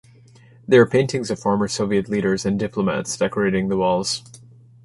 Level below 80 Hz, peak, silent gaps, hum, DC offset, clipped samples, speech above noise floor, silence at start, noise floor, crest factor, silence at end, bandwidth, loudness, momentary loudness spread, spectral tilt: -52 dBFS; -2 dBFS; none; none; under 0.1%; under 0.1%; 29 dB; 0.7 s; -49 dBFS; 18 dB; 0.45 s; 11.5 kHz; -20 LUFS; 8 LU; -5 dB/octave